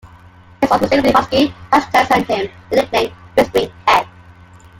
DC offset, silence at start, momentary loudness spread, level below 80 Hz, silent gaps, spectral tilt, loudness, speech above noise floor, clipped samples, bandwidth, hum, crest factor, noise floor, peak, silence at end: under 0.1%; 0.05 s; 6 LU; -44 dBFS; none; -4.5 dB/octave; -15 LUFS; 28 dB; under 0.1%; 17 kHz; none; 16 dB; -42 dBFS; 0 dBFS; 0.7 s